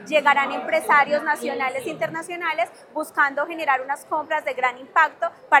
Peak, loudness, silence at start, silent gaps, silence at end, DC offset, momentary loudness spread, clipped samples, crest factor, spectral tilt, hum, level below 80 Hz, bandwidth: 0 dBFS; -22 LUFS; 0 s; none; 0 s; under 0.1%; 10 LU; under 0.1%; 22 dB; -3 dB/octave; none; -82 dBFS; 17.5 kHz